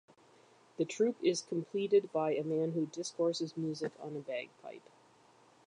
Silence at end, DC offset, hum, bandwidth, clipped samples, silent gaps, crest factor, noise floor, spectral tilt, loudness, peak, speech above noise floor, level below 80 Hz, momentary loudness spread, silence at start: 0.9 s; under 0.1%; none; 10.5 kHz; under 0.1%; none; 18 dB; -64 dBFS; -5 dB/octave; -35 LUFS; -18 dBFS; 30 dB; -88 dBFS; 16 LU; 0.8 s